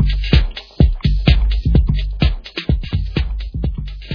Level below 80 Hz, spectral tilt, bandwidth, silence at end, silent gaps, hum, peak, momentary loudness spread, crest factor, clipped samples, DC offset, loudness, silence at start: -18 dBFS; -8 dB/octave; 5.4 kHz; 0 s; none; none; 0 dBFS; 9 LU; 16 dB; under 0.1%; under 0.1%; -18 LUFS; 0 s